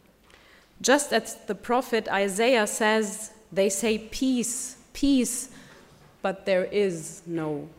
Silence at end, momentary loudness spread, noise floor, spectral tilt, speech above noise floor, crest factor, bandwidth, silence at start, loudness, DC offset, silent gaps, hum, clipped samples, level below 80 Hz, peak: 0.05 s; 11 LU; -56 dBFS; -3 dB/octave; 30 dB; 20 dB; 16 kHz; 0.8 s; -26 LUFS; under 0.1%; none; none; under 0.1%; -54 dBFS; -6 dBFS